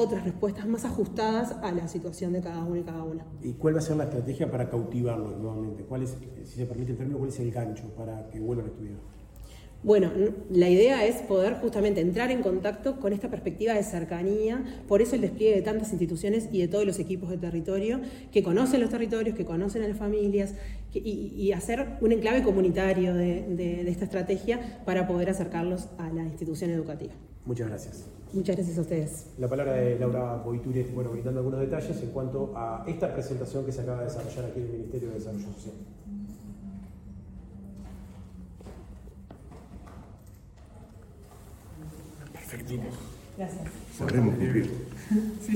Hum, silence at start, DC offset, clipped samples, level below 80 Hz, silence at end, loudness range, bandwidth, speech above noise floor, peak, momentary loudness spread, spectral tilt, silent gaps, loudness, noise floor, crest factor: none; 0 s; under 0.1%; under 0.1%; -48 dBFS; 0 s; 18 LU; 16.5 kHz; 21 dB; -10 dBFS; 21 LU; -7 dB/octave; none; -29 LUFS; -49 dBFS; 20 dB